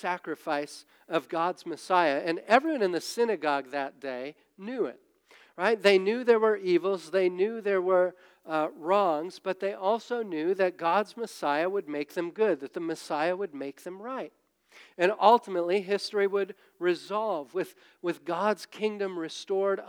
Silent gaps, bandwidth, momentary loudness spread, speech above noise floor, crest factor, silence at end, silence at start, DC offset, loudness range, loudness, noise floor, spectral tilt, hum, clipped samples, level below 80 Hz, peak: none; 17.5 kHz; 13 LU; 31 dB; 22 dB; 0 s; 0 s; under 0.1%; 5 LU; -28 LUFS; -59 dBFS; -5 dB/octave; none; under 0.1%; under -90 dBFS; -6 dBFS